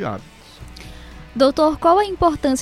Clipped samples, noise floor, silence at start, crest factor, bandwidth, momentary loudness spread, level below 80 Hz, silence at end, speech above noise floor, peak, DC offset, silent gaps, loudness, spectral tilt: under 0.1%; -38 dBFS; 0 s; 16 dB; 14.5 kHz; 22 LU; -40 dBFS; 0 s; 21 dB; -2 dBFS; under 0.1%; none; -17 LUFS; -5 dB/octave